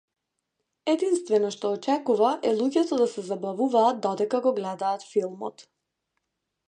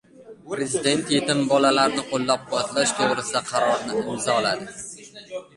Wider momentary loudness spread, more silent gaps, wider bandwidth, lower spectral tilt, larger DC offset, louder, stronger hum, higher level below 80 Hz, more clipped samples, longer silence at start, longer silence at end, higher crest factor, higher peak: second, 9 LU vs 16 LU; neither; second, 10 kHz vs 11.5 kHz; first, -5 dB/octave vs -3 dB/octave; neither; second, -25 LUFS vs -22 LUFS; neither; second, -80 dBFS vs -62 dBFS; neither; first, 0.85 s vs 0.2 s; first, 1.05 s vs 0.15 s; about the same, 18 dB vs 20 dB; second, -8 dBFS vs -4 dBFS